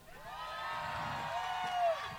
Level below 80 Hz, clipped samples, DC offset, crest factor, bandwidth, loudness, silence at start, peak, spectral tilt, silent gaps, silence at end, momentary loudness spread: -62 dBFS; under 0.1%; under 0.1%; 14 dB; 17 kHz; -38 LUFS; 0 s; -24 dBFS; -3.5 dB/octave; none; 0 s; 10 LU